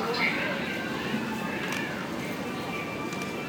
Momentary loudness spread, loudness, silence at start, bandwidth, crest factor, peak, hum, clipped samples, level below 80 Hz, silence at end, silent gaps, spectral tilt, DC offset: 7 LU; -30 LUFS; 0 s; over 20 kHz; 16 dB; -14 dBFS; none; under 0.1%; -60 dBFS; 0 s; none; -4.5 dB/octave; under 0.1%